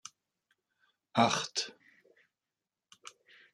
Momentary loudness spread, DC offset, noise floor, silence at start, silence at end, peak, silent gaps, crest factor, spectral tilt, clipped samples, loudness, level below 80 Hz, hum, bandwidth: 24 LU; under 0.1%; under -90 dBFS; 1.15 s; 1.8 s; -12 dBFS; none; 26 dB; -3 dB/octave; under 0.1%; -31 LUFS; -84 dBFS; none; 12.5 kHz